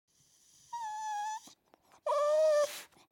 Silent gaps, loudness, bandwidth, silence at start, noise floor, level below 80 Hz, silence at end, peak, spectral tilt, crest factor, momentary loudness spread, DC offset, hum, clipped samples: none; -33 LUFS; 17 kHz; 0.7 s; -66 dBFS; -88 dBFS; 0.25 s; -22 dBFS; 0 dB/octave; 14 dB; 18 LU; under 0.1%; none; under 0.1%